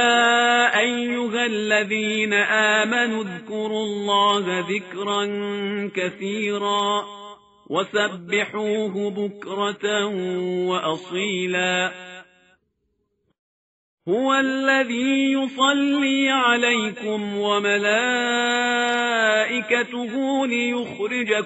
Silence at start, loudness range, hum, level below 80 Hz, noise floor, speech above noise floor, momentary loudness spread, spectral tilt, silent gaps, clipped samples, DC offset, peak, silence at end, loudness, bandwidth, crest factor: 0 s; 6 LU; none; -68 dBFS; -72 dBFS; 50 dB; 9 LU; -1.5 dB/octave; 13.39-13.98 s; under 0.1%; under 0.1%; -4 dBFS; 0 s; -21 LUFS; 8 kHz; 18 dB